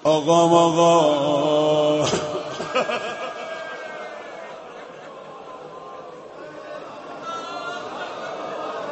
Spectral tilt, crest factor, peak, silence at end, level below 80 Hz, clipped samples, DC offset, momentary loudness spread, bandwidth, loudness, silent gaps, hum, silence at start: -4.5 dB/octave; 20 dB; -4 dBFS; 0 s; -62 dBFS; under 0.1%; under 0.1%; 22 LU; 8.6 kHz; -21 LUFS; none; none; 0 s